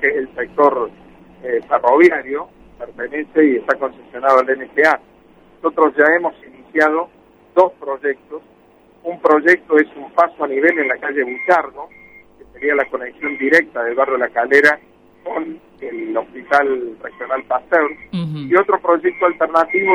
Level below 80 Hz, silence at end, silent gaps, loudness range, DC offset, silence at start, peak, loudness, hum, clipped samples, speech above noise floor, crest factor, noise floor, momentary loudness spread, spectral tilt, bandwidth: -58 dBFS; 0 s; none; 3 LU; under 0.1%; 0 s; 0 dBFS; -16 LUFS; none; under 0.1%; 33 dB; 18 dB; -50 dBFS; 16 LU; -6.5 dB/octave; 11 kHz